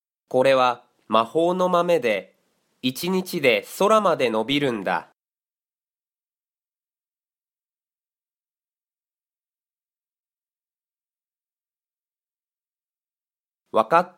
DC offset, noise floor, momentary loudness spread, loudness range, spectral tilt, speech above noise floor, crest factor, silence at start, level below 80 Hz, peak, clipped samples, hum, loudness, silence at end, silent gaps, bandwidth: under 0.1%; under -90 dBFS; 9 LU; 10 LU; -5 dB/octave; over 69 dB; 22 dB; 0.3 s; -70 dBFS; -4 dBFS; under 0.1%; none; -21 LUFS; 0.1 s; 10.20-10.24 s; 16.5 kHz